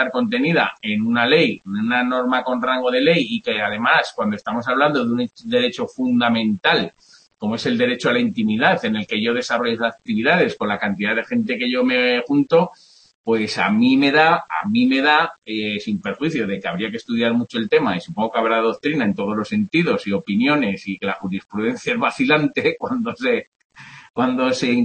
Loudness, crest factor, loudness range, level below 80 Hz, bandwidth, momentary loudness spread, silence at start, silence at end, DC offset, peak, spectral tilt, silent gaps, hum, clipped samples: -19 LUFS; 16 dB; 3 LU; -62 dBFS; 8.8 kHz; 8 LU; 0 s; 0 s; under 0.1%; -2 dBFS; -5.5 dB/octave; 13.15-13.24 s, 23.47-23.52 s, 23.65-23.70 s, 24.10-24.14 s; none; under 0.1%